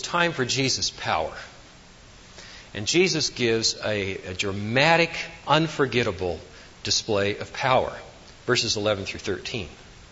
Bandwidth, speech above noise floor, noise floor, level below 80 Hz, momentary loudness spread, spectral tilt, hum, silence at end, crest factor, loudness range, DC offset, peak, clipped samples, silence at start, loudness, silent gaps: 8 kHz; 24 dB; -48 dBFS; -52 dBFS; 15 LU; -3.5 dB/octave; none; 0.05 s; 22 dB; 3 LU; under 0.1%; -4 dBFS; under 0.1%; 0 s; -24 LUFS; none